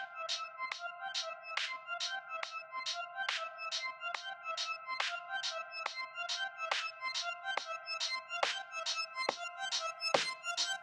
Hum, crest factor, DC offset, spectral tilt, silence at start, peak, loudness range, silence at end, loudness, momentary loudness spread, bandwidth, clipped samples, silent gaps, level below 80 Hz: none; 26 dB; under 0.1%; 1 dB/octave; 0 s; -14 dBFS; 3 LU; 0 s; -38 LUFS; 5 LU; 14 kHz; under 0.1%; none; under -90 dBFS